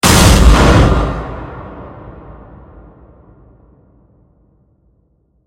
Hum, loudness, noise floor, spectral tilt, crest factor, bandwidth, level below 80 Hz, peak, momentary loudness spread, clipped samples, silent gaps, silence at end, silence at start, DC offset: none; -10 LUFS; -57 dBFS; -4.5 dB/octave; 14 dB; 17 kHz; -18 dBFS; 0 dBFS; 26 LU; 0.3%; none; 3.35 s; 0.05 s; under 0.1%